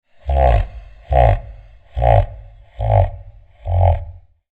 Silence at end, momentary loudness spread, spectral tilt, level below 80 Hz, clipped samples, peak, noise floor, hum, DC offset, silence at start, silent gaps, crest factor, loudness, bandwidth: 0.35 s; 16 LU; -9.5 dB/octave; -22 dBFS; under 0.1%; 0 dBFS; -39 dBFS; none; under 0.1%; 0.25 s; none; 18 dB; -18 LUFS; 4.2 kHz